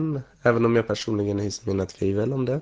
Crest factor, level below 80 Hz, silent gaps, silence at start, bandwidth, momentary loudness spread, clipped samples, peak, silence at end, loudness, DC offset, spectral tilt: 18 dB; -48 dBFS; none; 0 s; 8 kHz; 6 LU; under 0.1%; -6 dBFS; 0 s; -24 LUFS; under 0.1%; -6.5 dB/octave